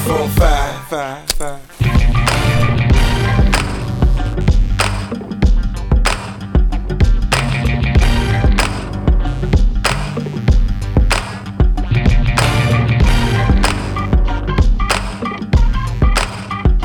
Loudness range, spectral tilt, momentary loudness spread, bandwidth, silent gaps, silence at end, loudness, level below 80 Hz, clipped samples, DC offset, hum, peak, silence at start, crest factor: 2 LU; -5.5 dB/octave; 7 LU; 17.5 kHz; none; 0 s; -16 LUFS; -16 dBFS; under 0.1%; under 0.1%; none; -2 dBFS; 0 s; 12 dB